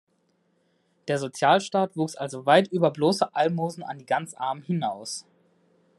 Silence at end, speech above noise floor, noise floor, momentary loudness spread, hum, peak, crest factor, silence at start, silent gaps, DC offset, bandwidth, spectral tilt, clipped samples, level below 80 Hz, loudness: 0.75 s; 44 dB; -69 dBFS; 13 LU; none; -4 dBFS; 22 dB; 1.05 s; none; under 0.1%; 12.5 kHz; -5 dB/octave; under 0.1%; -76 dBFS; -25 LUFS